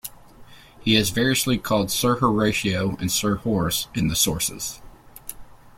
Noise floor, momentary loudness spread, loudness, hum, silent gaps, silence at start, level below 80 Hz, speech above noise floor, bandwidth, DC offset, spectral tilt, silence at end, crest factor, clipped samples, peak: -46 dBFS; 18 LU; -22 LUFS; none; none; 0.05 s; -44 dBFS; 24 dB; 16.5 kHz; under 0.1%; -3.5 dB/octave; 0.1 s; 20 dB; under 0.1%; -4 dBFS